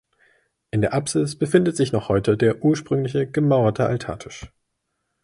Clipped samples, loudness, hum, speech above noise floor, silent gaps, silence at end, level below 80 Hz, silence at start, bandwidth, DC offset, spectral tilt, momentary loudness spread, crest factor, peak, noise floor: under 0.1%; -21 LUFS; none; 55 dB; none; 0.75 s; -50 dBFS; 0.75 s; 11.5 kHz; under 0.1%; -6.5 dB/octave; 10 LU; 20 dB; -2 dBFS; -76 dBFS